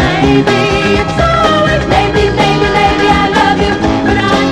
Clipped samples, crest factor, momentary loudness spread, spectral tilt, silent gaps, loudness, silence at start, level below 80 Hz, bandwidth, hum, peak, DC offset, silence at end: under 0.1%; 10 dB; 2 LU; -5.5 dB/octave; none; -10 LUFS; 0 s; -24 dBFS; 12.5 kHz; none; 0 dBFS; 0.8%; 0 s